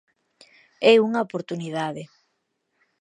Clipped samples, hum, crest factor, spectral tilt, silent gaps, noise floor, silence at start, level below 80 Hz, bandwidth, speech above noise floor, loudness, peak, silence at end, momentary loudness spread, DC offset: under 0.1%; none; 22 dB; -5.5 dB/octave; none; -75 dBFS; 0.8 s; -76 dBFS; 10 kHz; 54 dB; -22 LUFS; -2 dBFS; 0.95 s; 14 LU; under 0.1%